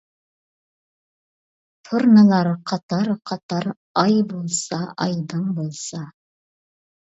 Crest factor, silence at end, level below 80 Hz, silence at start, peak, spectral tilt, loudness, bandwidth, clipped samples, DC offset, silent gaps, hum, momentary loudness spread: 20 dB; 0.9 s; -68 dBFS; 1.85 s; -2 dBFS; -5.5 dB/octave; -20 LUFS; 8 kHz; under 0.1%; under 0.1%; 2.83-2.89 s, 3.43-3.49 s, 3.77-3.95 s; none; 15 LU